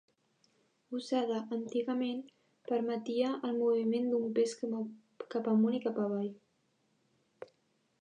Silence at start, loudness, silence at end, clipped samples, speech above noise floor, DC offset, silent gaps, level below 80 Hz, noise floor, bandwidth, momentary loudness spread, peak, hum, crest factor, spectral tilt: 0.9 s; -34 LUFS; 0.55 s; under 0.1%; 43 dB; under 0.1%; none; under -90 dBFS; -76 dBFS; 10 kHz; 14 LU; -20 dBFS; none; 16 dB; -6.5 dB/octave